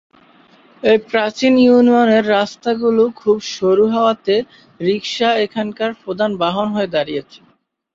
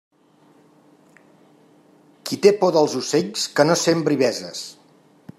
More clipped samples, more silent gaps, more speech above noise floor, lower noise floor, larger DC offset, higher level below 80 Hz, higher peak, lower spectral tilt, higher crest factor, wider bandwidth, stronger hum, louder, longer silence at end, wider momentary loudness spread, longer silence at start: neither; neither; about the same, 34 dB vs 36 dB; second, -49 dBFS vs -55 dBFS; neither; first, -58 dBFS vs -70 dBFS; about the same, -2 dBFS vs -2 dBFS; first, -5.5 dB/octave vs -4 dB/octave; second, 14 dB vs 20 dB; second, 7.6 kHz vs 14.5 kHz; neither; first, -16 LUFS vs -19 LUFS; about the same, 0.6 s vs 0.65 s; second, 10 LU vs 16 LU; second, 0.85 s vs 2.25 s